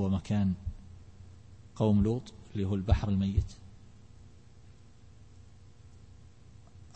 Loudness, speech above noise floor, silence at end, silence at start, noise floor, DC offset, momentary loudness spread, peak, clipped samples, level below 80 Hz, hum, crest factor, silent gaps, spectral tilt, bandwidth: -31 LUFS; 27 dB; 1.1 s; 0 s; -56 dBFS; 0.1%; 25 LU; -12 dBFS; under 0.1%; -42 dBFS; 60 Hz at -55 dBFS; 20 dB; none; -8.5 dB/octave; 8.6 kHz